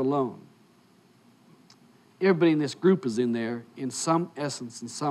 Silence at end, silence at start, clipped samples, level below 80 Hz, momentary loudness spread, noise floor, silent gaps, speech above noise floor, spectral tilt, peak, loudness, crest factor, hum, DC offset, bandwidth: 0 s; 0 s; under 0.1%; -80 dBFS; 12 LU; -59 dBFS; none; 33 dB; -5.5 dB/octave; -10 dBFS; -27 LUFS; 18 dB; none; under 0.1%; 12.5 kHz